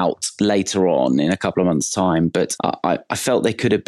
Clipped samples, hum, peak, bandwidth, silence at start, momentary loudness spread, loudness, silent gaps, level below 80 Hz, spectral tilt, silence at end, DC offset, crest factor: under 0.1%; none; -6 dBFS; 13 kHz; 0 s; 4 LU; -19 LUFS; none; -52 dBFS; -5 dB/octave; 0.05 s; under 0.1%; 14 dB